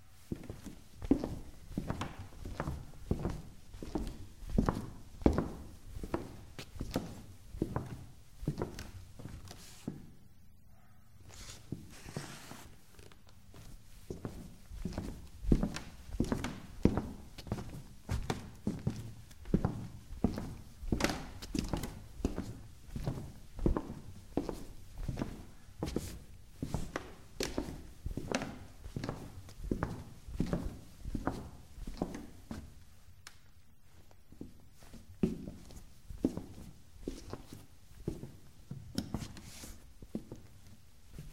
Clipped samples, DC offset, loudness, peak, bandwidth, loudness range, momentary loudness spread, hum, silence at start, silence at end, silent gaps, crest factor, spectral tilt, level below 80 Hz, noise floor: under 0.1%; 0.2%; -41 LUFS; -10 dBFS; 16 kHz; 11 LU; 20 LU; none; 0 s; 0 s; none; 30 dB; -6 dB/octave; -46 dBFS; -62 dBFS